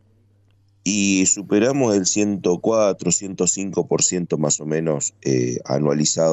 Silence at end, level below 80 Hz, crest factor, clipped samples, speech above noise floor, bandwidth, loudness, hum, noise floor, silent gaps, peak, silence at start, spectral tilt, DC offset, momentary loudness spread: 0 s; -58 dBFS; 14 dB; under 0.1%; 38 dB; 8.6 kHz; -19 LUFS; none; -57 dBFS; none; -6 dBFS; 0.85 s; -4 dB/octave; under 0.1%; 5 LU